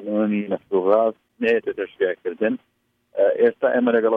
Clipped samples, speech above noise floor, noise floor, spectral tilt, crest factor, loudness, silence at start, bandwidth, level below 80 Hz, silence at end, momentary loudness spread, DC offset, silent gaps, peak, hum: under 0.1%; 34 dB; -54 dBFS; -8.5 dB/octave; 16 dB; -21 LUFS; 0 s; 5.2 kHz; -70 dBFS; 0 s; 7 LU; under 0.1%; none; -4 dBFS; none